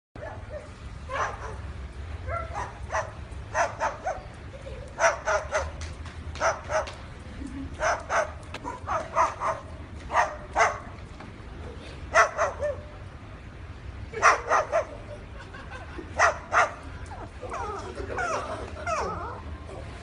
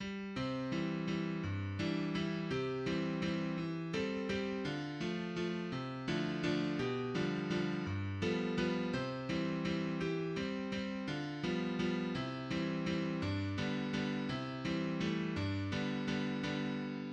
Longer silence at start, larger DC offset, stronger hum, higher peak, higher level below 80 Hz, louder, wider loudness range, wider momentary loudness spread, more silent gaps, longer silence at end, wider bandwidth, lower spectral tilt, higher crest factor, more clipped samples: first, 0.15 s vs 0 s; neither; neither; first, -6 dBFS vs -22 dBFS; first, -44 dBFS vs -62 dBFS; first, -28 LUFS vs -38 LUFS; first, 7 LU vs 1 LU; first, 18 LU vs 4 LU; neither; about the same, 0 s vs 0 s; first, 11 kHz vs 9.2 kHz; second, -4 dB/octave vs -6.5 dB/octave; first, 24 dB vs 14 dB; neither